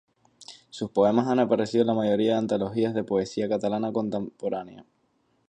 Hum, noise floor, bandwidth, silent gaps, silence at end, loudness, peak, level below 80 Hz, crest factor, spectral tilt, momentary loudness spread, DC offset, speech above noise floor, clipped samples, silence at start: none; -69 dBFS; 9.6 kHz; none; 0.65 s; -26 LUFS; -8 dBFS; -64 dBFS; 18 dB; -7 dB/octave; 13 LU; under 0.1%; 44 dB; under 0.1%; 0.4 s